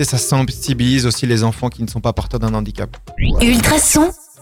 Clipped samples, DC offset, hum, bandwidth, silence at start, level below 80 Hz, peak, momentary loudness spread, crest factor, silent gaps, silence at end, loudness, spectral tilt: under 0.1%; under 0.1%; none; 19 kHz; 0 s; -26 dBFS; -2 dBFS; 11 LU; 12 dB; none; 0.25 s; -16 LUFS; -4.5 dB/octave